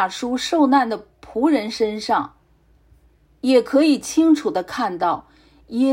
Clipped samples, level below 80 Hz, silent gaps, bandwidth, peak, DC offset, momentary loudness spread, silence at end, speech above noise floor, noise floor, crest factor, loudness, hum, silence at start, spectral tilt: under 0.1%; -56 dBFS; none; 16 kHz; -4 dBFS; under 0.1%; 11 LU; 0 s; 38 dB; -56 dBFS; 16 dB; -19 LUFS; none; 0 s; -4 dB/octave